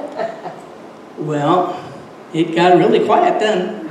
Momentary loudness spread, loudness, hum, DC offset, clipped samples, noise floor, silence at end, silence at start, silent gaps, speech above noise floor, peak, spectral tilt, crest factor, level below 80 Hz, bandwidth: 23 LU; -15 LUFS; none; under 0.1%; under 0.1%; -36 dBFS; 0 s; 0 s; none; 22 dB; 0 dBFS; -6.5 dB/octave; 16 dB; -66 dBFS; 10 kHz